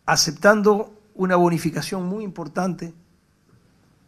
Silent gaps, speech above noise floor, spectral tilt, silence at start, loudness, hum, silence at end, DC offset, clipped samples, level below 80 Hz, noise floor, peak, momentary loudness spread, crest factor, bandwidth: none; 39 dB; -4.5 dB/octave; 0.05 s; -21 LUFS; none; 1.15 s; under 0.1%; under 0.1%; -56 dBFS; -60 dBFS; 0 dBFS; 15 LU; 22 dB; 15 kHz